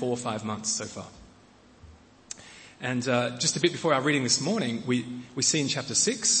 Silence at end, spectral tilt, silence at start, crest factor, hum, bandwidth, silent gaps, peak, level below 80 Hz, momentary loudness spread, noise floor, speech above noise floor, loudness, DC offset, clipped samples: 0 s; -3 dB/octave; 0 s; 20 dB; none; 8.8 kHz; none; -8 dBFS; -64 dBFS; 19 LU; -56 dBFS; 28 dB; -26 LUFS; under 0.1%; under 0.1%